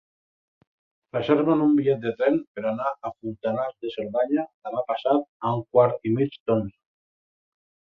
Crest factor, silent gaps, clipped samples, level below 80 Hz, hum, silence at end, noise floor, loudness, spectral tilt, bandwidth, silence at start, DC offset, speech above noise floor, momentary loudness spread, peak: 20 dB; 2.47-2.55 s, 4.54-4.62 s, 5.28-5.40 s, 6.40-6.46 s; under 0.1%; -64 dBFS; none; 1.25 s; under -90 dBFS; -25 LUFS; -9.5 dB/octave; 5.2 kHz; 1.15 s; under 0.1%; over 66 dB; 10 LU; -6 dBFS